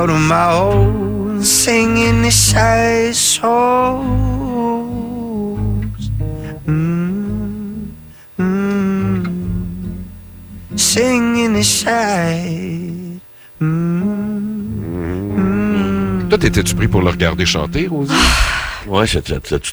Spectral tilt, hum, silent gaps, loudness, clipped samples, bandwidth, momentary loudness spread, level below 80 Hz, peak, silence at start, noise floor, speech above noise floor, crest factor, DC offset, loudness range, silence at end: -4 dB/octave; none; none; -15 LUFS; under 0.1%; over 20 kHz; 13 LU; -28 dBFS; 0 dBFS; 0 s; -35 dBFS; 22 dB; 16 dB; under 0.1%; 8 LU; 0 s